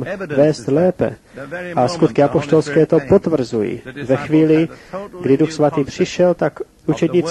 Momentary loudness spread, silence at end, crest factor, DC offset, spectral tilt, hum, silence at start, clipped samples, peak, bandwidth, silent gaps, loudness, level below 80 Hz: 10 LU; 0 s; 16 dB; under 0.1%; -7 dB/octave; none; 0 s; under 0.1%; 0 dBFS; 11.5 kHz; none; -17 LUFS; -48 dBFS